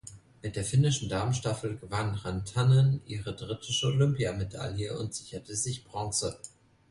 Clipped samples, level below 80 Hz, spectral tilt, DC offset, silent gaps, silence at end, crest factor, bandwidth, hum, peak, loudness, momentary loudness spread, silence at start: under 0.1%; -52 dBFS; -5 dB/octave; under 0.1%; none; 0.4 s; 18 dB; 11.5 kHz; none; -12 dBFS; -30 LUFS; 13 LU; 0.05 s